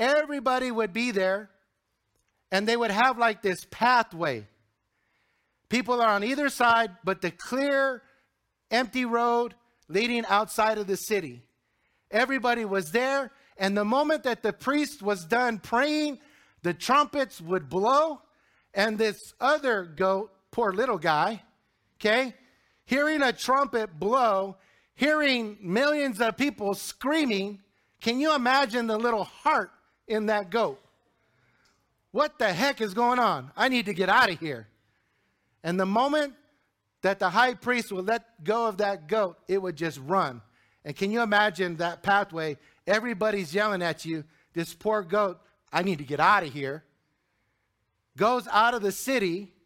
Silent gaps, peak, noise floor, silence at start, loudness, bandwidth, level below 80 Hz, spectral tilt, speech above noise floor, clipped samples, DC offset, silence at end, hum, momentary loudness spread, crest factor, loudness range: none; -8 dBFS; -77 dBFS; 0 s; -26 LUFS; 17 kHz; -66 dBFS; -4.5 dB/octave; 51 dB; under 0.1%; under 0.1%; 0.2 s; none; 9 LU; 20 dB; 2 LU